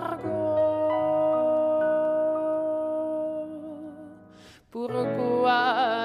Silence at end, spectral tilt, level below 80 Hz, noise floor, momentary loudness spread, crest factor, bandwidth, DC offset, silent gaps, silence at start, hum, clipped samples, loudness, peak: 0 s; -6.5 dB/octave; -68 dBFS; -51 dBFS; 16 LU; 16 dB; 10 kHz; under 0.1%; none; 0 s; none; under 0.1%; -25 LUFS; -10 dBFS